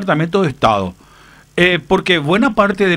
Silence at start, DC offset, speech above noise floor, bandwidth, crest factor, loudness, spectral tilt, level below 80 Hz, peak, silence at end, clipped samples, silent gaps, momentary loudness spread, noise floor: 0 s; under 0.1%; 30 dB; 15 kHz; 14 dB; -14 LUFS; -6 dB/octave; -42 dBFS; 0 dBFS; 0 s; under 0.1%; none; 6 LU; -44 dBFS